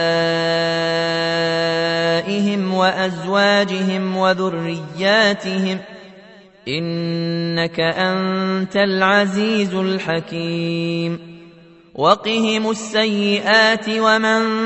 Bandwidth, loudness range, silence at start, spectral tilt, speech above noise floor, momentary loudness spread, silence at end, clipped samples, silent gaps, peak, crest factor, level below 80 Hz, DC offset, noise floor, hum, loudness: 8.4 kHz; 3 LU; 0 s; -5 dB/octave; 27 dB; 8 LU; 0 s; under 0.1%; none; 0 dBFS; 18 dB; -60 dBFS; under 0.1%; -45 dBFS; none; -18 LUFS